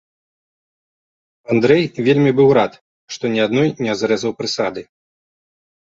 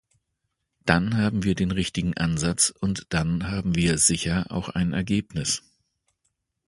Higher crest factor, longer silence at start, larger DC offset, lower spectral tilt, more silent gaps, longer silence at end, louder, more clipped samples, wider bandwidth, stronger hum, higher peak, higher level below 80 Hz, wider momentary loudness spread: second, 16 dB vs 24 dB; first, 1.5 s vs 0.85 s; neither; first, -6 dB/octave vs -4 dB/octave; first, 2.81-3.07 s vs none; about the same, 1 s vs 1.1 s; first, -17 LUFS vs -24 LUFS; neither; second, 7.8 kHz vs 11.5 kHz; neither; about the same, -2 dBFS vs 0 dBFS; second, -58 dBFS vs -44 dBFS; first, 11 LU vs 7 LU